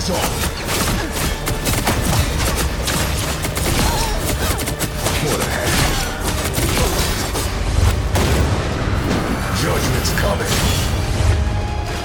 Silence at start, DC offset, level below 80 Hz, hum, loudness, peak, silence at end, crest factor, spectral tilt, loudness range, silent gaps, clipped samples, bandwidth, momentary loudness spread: 0 s; under 0.1%; -24 dBFS; none; -19 LUFS; -2 dBFS; 0 s; 16 dB; -4 dB/octave; 1 LU; none; under 0.1%; 19.5 kHz; 4 LU